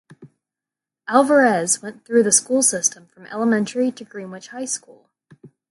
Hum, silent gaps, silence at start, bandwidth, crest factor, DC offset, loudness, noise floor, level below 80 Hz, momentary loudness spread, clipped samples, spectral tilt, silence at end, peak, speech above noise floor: none; none; 0.2 s; 12 kHz; 20 dB; under 0.1%; -18 LUFS; -88 dBFS; -72 dBFS; 19 LU; under 0.1%; -3 dB/octave; 0.25 s; 0 dBFS; 69 dB